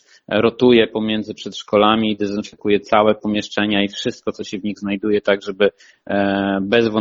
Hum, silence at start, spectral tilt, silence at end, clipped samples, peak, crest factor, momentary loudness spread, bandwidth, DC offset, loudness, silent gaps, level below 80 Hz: none; 0.3 s; -5.5 dB/octave; 0 s; under 0.1%; 0 dBFS; 18 dB; 10 LU; 7.6 kHz; under 0.1%; -18 LUFS; none; -54 dBFS